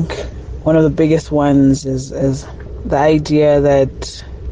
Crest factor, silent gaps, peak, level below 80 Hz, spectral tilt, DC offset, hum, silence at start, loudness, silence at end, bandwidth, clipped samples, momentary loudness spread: 12 dB; none; -2 dBFS; -30 dBFS; -7 dB/octave; under 0.1%; none; 0 s; -14 LUFS; 0 s; 9.6 kHz; under 0.1%; 16 LU